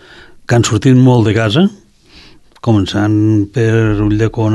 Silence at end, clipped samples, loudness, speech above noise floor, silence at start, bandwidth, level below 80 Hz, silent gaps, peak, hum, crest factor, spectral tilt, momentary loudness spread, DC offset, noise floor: 0 s; under 0.1%; -12 LUFS; 31 dB; 0.5 s; 11.5 kHz; -34 dBFS; none; 0 dBFS; none; 12 dB; -6.5 dB/octave; 6 LU; under 0.1%; -41 dBFS